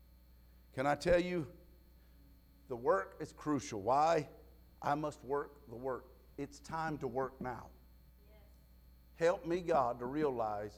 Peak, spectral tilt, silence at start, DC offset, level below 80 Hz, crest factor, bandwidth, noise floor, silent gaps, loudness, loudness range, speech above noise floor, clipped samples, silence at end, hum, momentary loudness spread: -18 dBFS; -6 dB/octave; 0.75 s; under 0.1%; -60 dBFS; 20 dB; 14.5 kHz; -62 dBFS; none; -37 LUFS; 7 LU; 26 dB; under 0.1%; 0 s; none; 16 LU